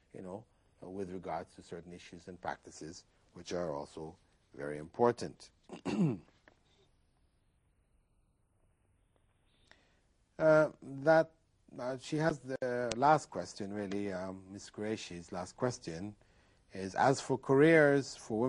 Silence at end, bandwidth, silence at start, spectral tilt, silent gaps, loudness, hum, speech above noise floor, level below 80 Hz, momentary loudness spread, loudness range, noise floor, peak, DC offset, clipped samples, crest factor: 0 s; 11 kHz; 0.15 s; -6 dB/octave; none; -33 LUFS; none; 40 dB; -70 dBFS; 21 LU; 13 LU; -73 dBFS; -10 dBFS; under 0.1%; under 0.1%; 24 dB